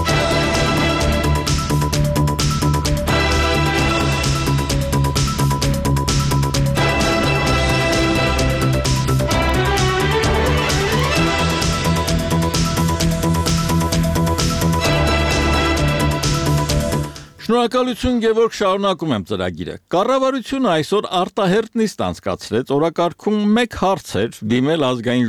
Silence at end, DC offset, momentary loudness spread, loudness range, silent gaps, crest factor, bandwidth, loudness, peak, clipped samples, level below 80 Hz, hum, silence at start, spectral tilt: 0 s; under 0.1%; 4 LU; 2 LU; none; 12 dB; 15.5 kHz; -17 LUFS; -4 dBFS; under 0.1%; -26 dBFS; none; 0 s; -5 dB/octave